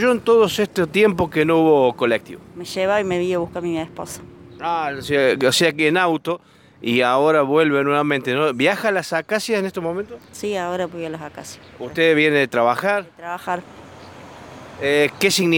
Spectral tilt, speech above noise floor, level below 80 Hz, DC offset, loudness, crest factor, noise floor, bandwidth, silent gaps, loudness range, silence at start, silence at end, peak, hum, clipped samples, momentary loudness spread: -4.5 dB/octave; 21 dB; -56 dBFS; under 0.1%; -19 LUFS; 16 dB; -40 dBFS; 17 kHz; none; 5 LU; 0 s; 0 s; -2 dBFS; none; under 0.1%; 17 LU